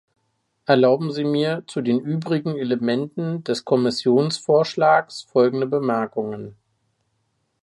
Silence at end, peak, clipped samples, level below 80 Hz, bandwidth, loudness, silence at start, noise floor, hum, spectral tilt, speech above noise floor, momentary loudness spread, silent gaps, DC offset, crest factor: 1.1 s; -2 dBFS; under 0.1%; -68 dBFS; 11.5 kHz; -21 LUFS; 0.7 s; -71 dBFS; none; -6.5 dB/octave; 51 dB; 9 LU; none; under 0.1%; 18 dB